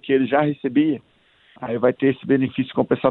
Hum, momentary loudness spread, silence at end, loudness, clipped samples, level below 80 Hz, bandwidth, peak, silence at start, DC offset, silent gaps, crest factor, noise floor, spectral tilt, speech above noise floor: none; 8 LU; 0 s; -21 LUFS; under 0.1%; -62 dBFS; 4.1 kHz; -2 dBFS; 0.05 s; under 0.1%; none; 18 dB; -54 dBFS; -10.5 dB/octave; 34 dB